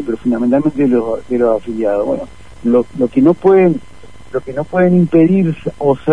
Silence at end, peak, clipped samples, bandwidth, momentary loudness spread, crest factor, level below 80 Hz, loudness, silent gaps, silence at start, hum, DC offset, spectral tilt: 0 s; 0 dBFS; under 0.1%; 10 kHz; 12 LU; 12 dB; -44 dBFS; -14 LUFS; none; 0 s; none; 2%; -9.5 dB/octave